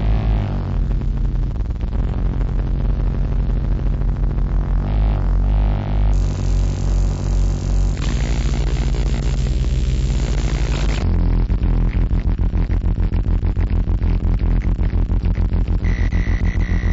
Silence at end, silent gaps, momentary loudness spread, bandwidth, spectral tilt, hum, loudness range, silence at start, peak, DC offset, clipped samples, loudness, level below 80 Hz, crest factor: 0 s; none; 3 LU; 7.8 kHz; -7 dB/octave; none; 2 LU; 0 s; -8 dBFS; 0.7%; under 0.1%; -21 LUFS; -18 dBFS; 10 dB